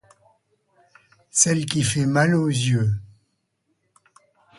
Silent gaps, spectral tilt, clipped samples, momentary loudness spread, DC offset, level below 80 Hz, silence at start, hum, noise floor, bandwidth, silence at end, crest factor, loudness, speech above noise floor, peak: none; -4 dB/octave; under 0.1%; 7 LU; under 0.1%; -54 dBFS; 1.35 s; none; -72 dBFS; 11.5 kHz; 1.55 s; 22 dB; -21 LUFS; 52 dB; -2 dBFS